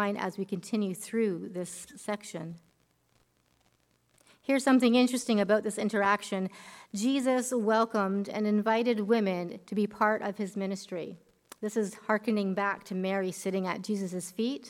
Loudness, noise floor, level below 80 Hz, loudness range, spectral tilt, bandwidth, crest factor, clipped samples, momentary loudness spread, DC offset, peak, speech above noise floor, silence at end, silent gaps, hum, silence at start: -30 LUFS; -70 dBFS; -76 dBFS; 8 LU; -5 dB/octave; 15.5 kHz; 18 dB; under 0.1%; 12 LU; under 0.1%; -12 dBFS; 41 dB; 0 s; none; none; 0 s